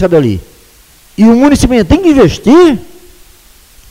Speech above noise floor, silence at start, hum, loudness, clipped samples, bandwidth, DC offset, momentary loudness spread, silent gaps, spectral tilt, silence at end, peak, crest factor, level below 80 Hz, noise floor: 35 dB; 0 s; none; -7 LUFS; 0.4%; 16 kHz; under 0.1%; 12 LU; none; -6.5 dB/octave; 1.05 s; 0 dBFS; 8 dB; -26 dBFS; -41 dBFS